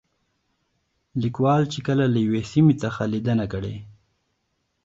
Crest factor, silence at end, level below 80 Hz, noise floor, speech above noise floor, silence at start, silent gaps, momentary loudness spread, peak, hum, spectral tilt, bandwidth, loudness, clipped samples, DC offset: 18 dB; 0.95 s; -52 dBFS; -74 dBFS; 52 dB; 1.15 s; none; 12 LU; -6 dBFS; none; -7.5 dB/octave; 7.8 kHz; -22 LUFS; under 0.1%; under 0.1%